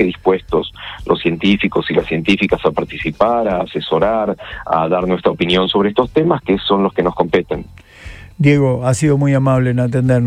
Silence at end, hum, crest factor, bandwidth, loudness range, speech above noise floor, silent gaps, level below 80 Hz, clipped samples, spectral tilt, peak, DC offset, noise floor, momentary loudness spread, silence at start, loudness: 0 s; none; 14 dB; 11 kHz; 1 LU; 20 dB; none; -38 dBFS; under 0.1%; -6.5 dB/octave; 0 dBFS; under 0.1%; -35 dBFS; 7 LU; 0 s; -16 LUFS